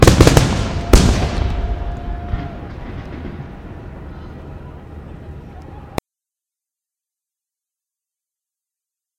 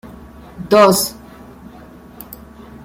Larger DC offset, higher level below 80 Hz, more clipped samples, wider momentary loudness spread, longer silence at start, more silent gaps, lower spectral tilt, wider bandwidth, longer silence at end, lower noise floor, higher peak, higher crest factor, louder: neither; first, -24 dBFS vs -46 dBFS; first, 0.1% vs under 0.1%; second, 22 LU vs 27 LU; about the same, 0 s vs 0.05 s; neither; first, -5.5 dB/octave vs -4 dB/octave; about the same, 16.5 kHz vs 16.5 kHz; first, 3.2 s vs 0.5 s; first, -87 dBFS vs -39 dBFS; about the same, 0 dBFS vs 0 dBFS; about the same, 20 dB vs 18 dB; second, -17 LUFS vs -13 LUFS